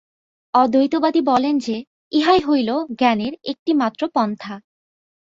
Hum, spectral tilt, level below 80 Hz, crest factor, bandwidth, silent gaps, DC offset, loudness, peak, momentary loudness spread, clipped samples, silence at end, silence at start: none; -5.5 dB/octave; -58 dBFS; 16 dB; 7.8 kHz; 1.87-2.11 s, 3.59-3.66 s; under 0.1%; -19 LUFS; -2 dBFS; 11 LU; under 0.1%; 0.65 s; 0.55 s